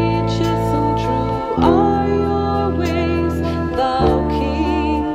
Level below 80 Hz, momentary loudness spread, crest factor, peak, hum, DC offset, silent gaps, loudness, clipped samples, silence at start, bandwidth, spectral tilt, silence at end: -28 dBFS; 4 LU; 16 dB; -2 dBFS; none; under 0.1%; none; -18 LUFS; under 0.1%; 0 s; 15 kHz; -7.5 dB/octave; 0 s